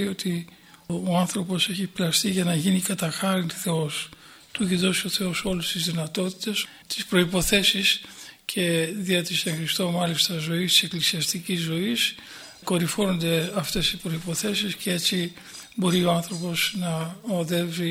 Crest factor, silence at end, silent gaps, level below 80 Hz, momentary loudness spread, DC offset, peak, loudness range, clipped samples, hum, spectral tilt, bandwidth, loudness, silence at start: 20 dB; 0 s; none; -52 dBFS; 9 LU; under 0.1%; -6 dBFS; 3 LU; under 0.1%; none; -3.5 dB/octave; 16.5 kHz; -24 LUFS; 0 s